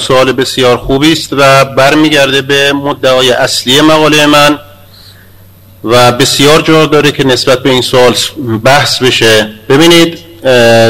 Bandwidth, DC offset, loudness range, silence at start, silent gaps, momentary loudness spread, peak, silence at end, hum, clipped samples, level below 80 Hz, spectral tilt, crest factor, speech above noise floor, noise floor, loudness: 17 kHz; 2%; 2 LU; 0 s; none; 5 LU; 0 dBFS; 0 s; none; 2%; -36 dBFS; -4 dB/octave; 6 dB; 30 dB; -36 dBFS; -6 LUFS